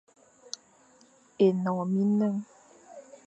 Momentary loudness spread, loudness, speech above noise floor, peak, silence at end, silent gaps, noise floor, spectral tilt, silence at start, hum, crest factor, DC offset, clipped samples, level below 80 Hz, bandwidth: 24 LU; -27 LUFS; 35 dB; -12 dBFS; 0.25 s; none; -60 dBFS; -7.5 dB/octave; 1.4 s; none; 18 dB; under 0.1%; under 0.1%; -82 dBFS; 8.2 kHz